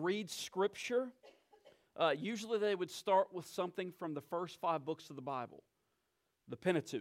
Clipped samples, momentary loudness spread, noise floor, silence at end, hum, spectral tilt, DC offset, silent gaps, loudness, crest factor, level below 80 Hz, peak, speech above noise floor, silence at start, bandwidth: under 0.1%; 11 LU; -84 dBFS; 0 s; none; -4.5 dB/octave; under 0.1%; none; -38 LUFS; 20 dB; -88 dBFS; -20 dBFS; 45 dB; 0 s; 16.5 kHz